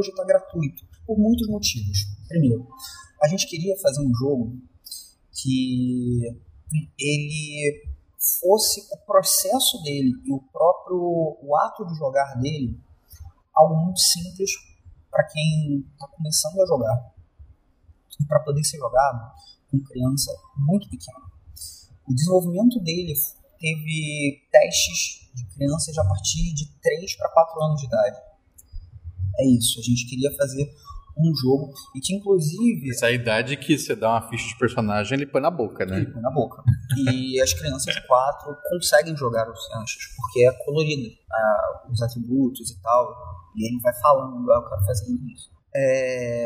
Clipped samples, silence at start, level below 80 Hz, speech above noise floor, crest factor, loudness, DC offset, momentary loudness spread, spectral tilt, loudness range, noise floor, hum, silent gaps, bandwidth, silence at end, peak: under 0.1%; 0 s; -46 dBFS; 34 dB; 22 dB; -23 LUFS; under 0.1%; 12 LU; -4.5 dB/octave; 4 LU; -56 dBFS; none; none; 16 kHz; 0 s; 0 dBFS